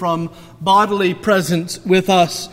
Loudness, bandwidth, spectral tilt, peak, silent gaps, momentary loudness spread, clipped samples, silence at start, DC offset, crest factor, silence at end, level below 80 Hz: -16 LUFS; 16 kHz; -5 dB/octave; -2 dBFS; none; 10 LU; under 0.1%; 0 s; under 0.1%; 16 dB; 0 s; -52 dBFS